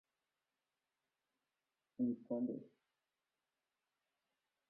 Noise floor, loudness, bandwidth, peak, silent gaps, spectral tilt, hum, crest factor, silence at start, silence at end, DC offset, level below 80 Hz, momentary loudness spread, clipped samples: under -90 dBFS; -43 LUFS; 1.5 kHz; -30 dBFS; none; -11.5 dB/octave; none; 20 dB; 2 s; 2 s; under 0.1%; -90 dBFS; 12 LU; under 0.1%